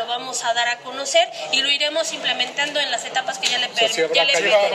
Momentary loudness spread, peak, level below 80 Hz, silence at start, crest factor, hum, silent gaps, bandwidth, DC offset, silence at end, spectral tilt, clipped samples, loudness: 7 LU; -2 dBFS; -82 dBFS; 0 s; 18 dB; none; none; 13 kHz; under 0.1%; 0 s; 0 dB/octave; under 0.1%; -19 LUFS